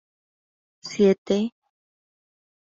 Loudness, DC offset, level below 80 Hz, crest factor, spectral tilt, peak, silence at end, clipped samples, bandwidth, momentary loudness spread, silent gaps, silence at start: -22 LUFS; under 0.1%; -68 dBFS; 20 dB; -6 dB/octave; -8 dBFS; 1.1 s; under 0.1%; 7.8 kHz; 16 LU; 1.18-1.25 s; 0.85 s